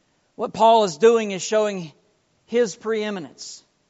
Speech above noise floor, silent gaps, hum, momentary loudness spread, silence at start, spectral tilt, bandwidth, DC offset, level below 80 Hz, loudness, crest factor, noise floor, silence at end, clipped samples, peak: 43 dB; none; none; 20 LU; 0.4 s; -3 dB/octave; 8 kHz; under 0.1%; -70 dBFS; -20 LUFS; 18 dB; -64 dBFS; 0.3 s; under 0.1%; -4 dBFS